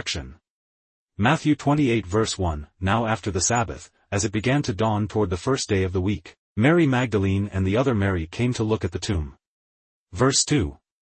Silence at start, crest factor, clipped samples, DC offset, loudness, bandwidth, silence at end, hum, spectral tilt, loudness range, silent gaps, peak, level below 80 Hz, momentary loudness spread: 0 s; 18 dB; under 0.1%; under 0.1%; -23 LUFS; 8.8 kHz; 0.4 s; none; -5 dB/octave; 2 LU; 0.50-1.09 s, 6.38-6.56 s, 9.47-10.07 s; -6 dBFS; -46 dBFS; 10 LU